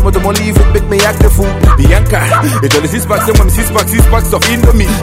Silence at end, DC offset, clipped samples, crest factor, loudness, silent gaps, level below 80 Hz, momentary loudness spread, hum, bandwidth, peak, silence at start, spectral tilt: 0 s; under 0.1%; 2%; 8 dB; -9 LUFS; none; -12 dBFS; 2 LU; none; 16.5 kHz; 0 dBFS; 0 s; -5 dB/octave